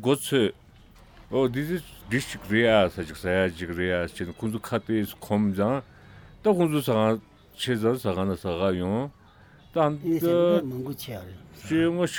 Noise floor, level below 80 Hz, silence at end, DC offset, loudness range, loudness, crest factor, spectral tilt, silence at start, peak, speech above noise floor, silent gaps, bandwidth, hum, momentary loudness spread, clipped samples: -53 dBFS; -54 dBFS; 0 s; under 0.1%; 2 LU; -26 LUFS; 20 dB; -6 dB/octave; 0 s; -6 dBFS; 28 dB; none; over 20 kHz; none; 11 LU; under 0.1%